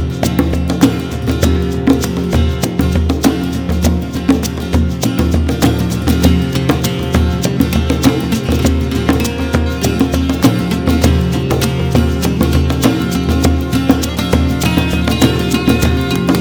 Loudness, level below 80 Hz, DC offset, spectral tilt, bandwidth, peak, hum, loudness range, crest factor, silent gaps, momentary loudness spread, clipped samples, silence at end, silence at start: -14 LUFS; -20 dBFS; under 0.1%; -6 dB/octave; over 20 kHz; 0 dBFS; none; 1 LU; 12 dB; none; 3 LU; under 0.1%; 0 s; 0 s